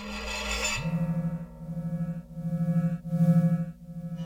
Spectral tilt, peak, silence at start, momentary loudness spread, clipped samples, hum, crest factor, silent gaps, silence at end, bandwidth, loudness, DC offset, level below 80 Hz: -5.5 dB/octave; -14 dBFS; 0 s; 14 LU; under 0.1%; none; 14 dB; none; 0 s; 15.5 kHz; -29 LUFS; under 0.1%; -46 dBFS